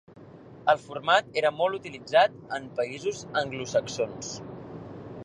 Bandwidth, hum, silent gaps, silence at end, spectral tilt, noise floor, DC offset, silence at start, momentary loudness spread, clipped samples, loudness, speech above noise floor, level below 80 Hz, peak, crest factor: 10.5 kHz; none; none; 0 s; -3.5 dB/octave; -48 dBFS; under 0.1%; 0.1 s; 18 LU; under 0.1%; -27 LUFS; 21 dB; -64 dBFS; -8 dBFS; 20 dB